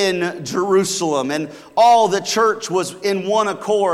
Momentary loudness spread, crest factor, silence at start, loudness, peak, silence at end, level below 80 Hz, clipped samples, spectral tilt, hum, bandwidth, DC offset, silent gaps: 9 LU; 12 dB; 0 s; -18 LUFS; -4 dBFS; 0 s; -64 dBFS; under 0.1%; -3.5 dB/octave; none; 15.5 kHz; under 0.1%; none